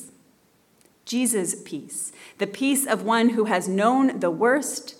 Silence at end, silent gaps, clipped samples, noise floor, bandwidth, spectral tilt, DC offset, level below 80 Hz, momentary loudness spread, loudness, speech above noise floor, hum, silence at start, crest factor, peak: 0.05 s; none; under 0.1%; -61 dBFS; 18 kHz; -3.5 dB/octave; under 0.1%; -78 dBFS; 11 LU; -23 LUFS; 38 dB; none; 0 s; 16 dB; -8 dBFS